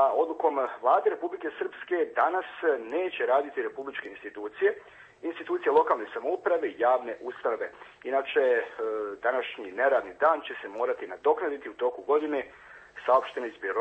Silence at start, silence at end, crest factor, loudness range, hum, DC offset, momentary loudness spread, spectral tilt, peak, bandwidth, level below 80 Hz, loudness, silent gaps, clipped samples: 0 s; 0 s; 18 dB; 2 LU; none; under 0.1%; 12 LU; -5 dB/octave; -10 dBFS; 8 kHz; -72 dBFS; -28 LUFS; none; under 0.1%